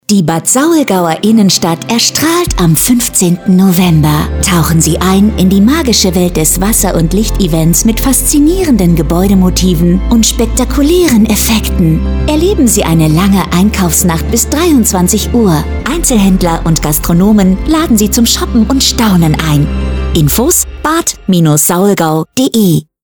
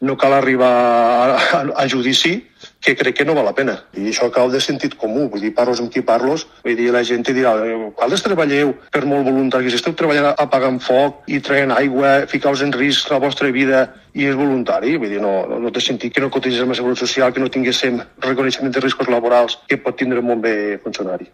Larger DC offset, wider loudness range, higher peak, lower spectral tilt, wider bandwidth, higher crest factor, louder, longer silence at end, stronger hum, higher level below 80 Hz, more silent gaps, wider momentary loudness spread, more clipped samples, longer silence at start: first, 0.3% vs under 0.1%; about the same, 1 LU vs 2 LU; about the same, 0 dBFS vs 0 dBFS; about the same, -4.5 dB/octave vs -4.5 dB/octave; first, over 20 kHz vs 13 kHz; second, 8 dB vs 16 dB; first, -9 LUFS vs -16 LUFS; first, 0.25 s vs 0.1 s; neither; first, -20 dBFS vs -58 dBFS; neither; second, 4 LU vs 7 LU; neither; about the same, 0.1 s vs 0 s